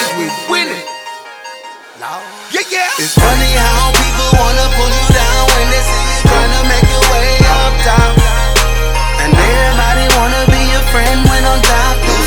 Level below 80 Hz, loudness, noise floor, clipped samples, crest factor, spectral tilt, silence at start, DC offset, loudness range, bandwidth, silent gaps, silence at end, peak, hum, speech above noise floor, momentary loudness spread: -14 dBFS; -11 LUFS; -31 dBFS; 0.3%; 10 dB; -3.5 dB/octave; 0 s; under 0.1%; 4 LU; 19 kHz; none; 0 s; 0 dBFS; none; 19 dB; 15 LU